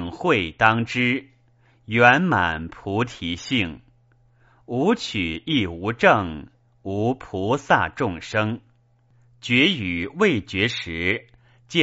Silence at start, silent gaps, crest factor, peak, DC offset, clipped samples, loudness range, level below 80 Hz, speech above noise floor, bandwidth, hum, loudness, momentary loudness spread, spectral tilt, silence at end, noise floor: 0 s; none; 22 dB; 0 dBFS; under 0.1%; under 0.1%; 5 LU; -50 dBFS; 37 dB; 8 kHz; none; -22 LUFS; 11 LU; -3 dB/octave; 0 s; -59 dBFS